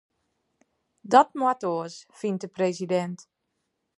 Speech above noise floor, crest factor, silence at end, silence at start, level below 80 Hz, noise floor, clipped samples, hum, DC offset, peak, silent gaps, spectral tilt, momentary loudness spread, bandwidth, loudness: 54 dB; 26 dB; 0.8 s; 1.05 s; -80 dBFS; -78 dBFS; under 0.1%; none; under 0.1%; -2 dBFS; none; -5.5 dB/octave; 15 LU; 11.5 kHz; -25 LUFS